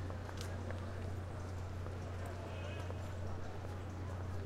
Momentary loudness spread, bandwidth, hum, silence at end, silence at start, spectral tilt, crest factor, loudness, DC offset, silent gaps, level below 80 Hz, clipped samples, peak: 1 LU; 13.5 kHz; none; 0 s; 0 s; -6.5 dB/octave; 16 dB; -45 LUFS; under 0.1%; none; -54 dBFS; under 0.1%; -26 dBFS